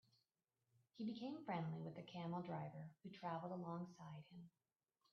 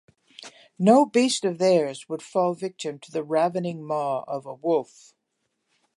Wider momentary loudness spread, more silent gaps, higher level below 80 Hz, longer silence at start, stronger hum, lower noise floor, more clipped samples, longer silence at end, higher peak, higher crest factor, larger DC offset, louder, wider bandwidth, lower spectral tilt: second, 11 LU vs 16 LU; neither; second, -88 dBFS vs -80 dBFS; first, 0.95 s vs 0.4 s; neither; first, under -90 dBFS vs -77 dBFS; neither; second, 0.65 s vs 1.1 s; second, -34 dBFS vs -4 dBFS; about the same, 18 dB vs 20 dB; neither; second, -51 LUFS vs -24 LUFS; second, 6.6 kHz vs 11.5 kHz; first, -6.5 dB/octave vs -5 dB/octave